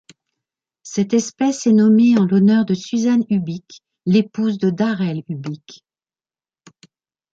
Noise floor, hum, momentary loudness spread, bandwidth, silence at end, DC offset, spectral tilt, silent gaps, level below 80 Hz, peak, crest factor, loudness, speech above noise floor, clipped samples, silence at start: under -90 dBFS; none; 15 LU; 7.8 kHz; 1.6 s; under 0.1%; -6.5 dB/octave; none; -64 dBFS; -4 dBFS; 14 dB; -17 LUFS; over 73 dB; under 0.1%; 0.85 s